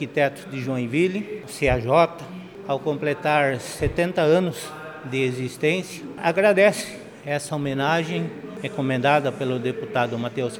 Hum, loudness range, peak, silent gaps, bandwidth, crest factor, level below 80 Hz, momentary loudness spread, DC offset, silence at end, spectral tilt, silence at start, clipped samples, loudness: none; 2 LU; -4 dBFS; none; 19 kHz; 18 dB; -46 dBFS; 13 LU; under 0.1%; 0 s; -5.5 dB/octave; 0 s; under 0.1%; -23 LUFS